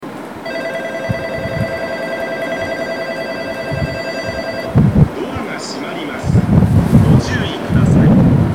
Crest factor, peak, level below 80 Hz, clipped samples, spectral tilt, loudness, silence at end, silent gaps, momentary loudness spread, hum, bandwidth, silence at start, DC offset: 14 dB; 0 dBFS; -30 dBFS; under 0.1%; -7.5 dB/octave; -16 LUFS; 0 s; none; 12 LU; none; 15.5 kHz; 0 s; 0.3%